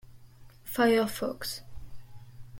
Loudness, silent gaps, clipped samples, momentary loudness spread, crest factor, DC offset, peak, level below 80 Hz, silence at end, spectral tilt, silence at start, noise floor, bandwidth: -29 LUFS; none; under 0.1%; 16 LU; 18 dB; under 0.1%; -14 dBFS; -54 dBFS; 0 s; -4 dB/octave; 0.05 s; -52 dBFS; 16.5 kHz